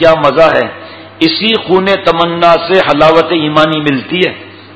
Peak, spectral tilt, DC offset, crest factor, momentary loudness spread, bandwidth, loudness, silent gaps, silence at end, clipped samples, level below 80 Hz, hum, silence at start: 0 dBFS; -6 dB/octave; under 0.1%; 10 dB; 7 LU; 8 kHz; -9 LUFS; none; 0 s; 2%; -42 dBFS; none; 0 s